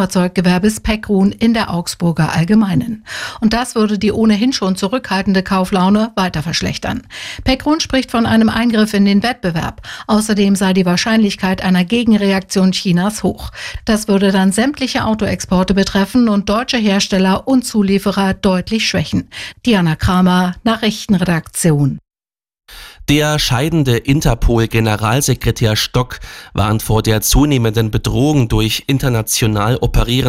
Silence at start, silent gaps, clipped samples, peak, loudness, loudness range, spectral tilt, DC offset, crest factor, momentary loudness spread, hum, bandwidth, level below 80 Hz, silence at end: 0 s; none; under 0.1%; -2 dBFS; -14 LUFS; 2 LU; -5 dB/octave; under 0.1%; 12 dB; 6 LU; none; 16 kHz; -30 dBFS; 0 s